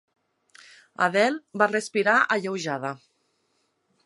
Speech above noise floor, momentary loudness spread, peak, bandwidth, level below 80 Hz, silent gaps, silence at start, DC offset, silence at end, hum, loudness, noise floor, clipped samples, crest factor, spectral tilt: 48 dB; 11 LU; -4 dBFS; 11.5 kHz; -80 dBFS; none; 1 s; under 0.1%; 1.1 s; none; -24 LUFS; -72 dBFS; under 0.1%; 22 dB; -4 dB/octave